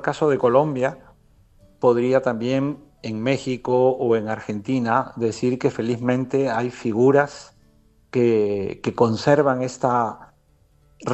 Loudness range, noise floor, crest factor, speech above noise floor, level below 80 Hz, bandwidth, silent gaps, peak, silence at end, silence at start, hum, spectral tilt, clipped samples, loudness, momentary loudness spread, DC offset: 2 LU; -58 dBFS; 18 dB; 38 dB; -58 dBFS; 8.4 kHz; none; -2 dBFS; 0 s; 0 s; none; -7 dB/octave; under 0.1%; -21 LUFS; 10 LU; under 0.1%